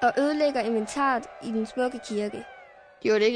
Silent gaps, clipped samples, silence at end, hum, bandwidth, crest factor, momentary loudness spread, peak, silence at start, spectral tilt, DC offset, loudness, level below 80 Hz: none; under 0.1%; 0 s; none; 10.5 kHz; 14 dB; 9 LU; -12 dBFS; 0 s; -4.5 dB/octave; under 0.1%; -27 LUFS; -64 dBFS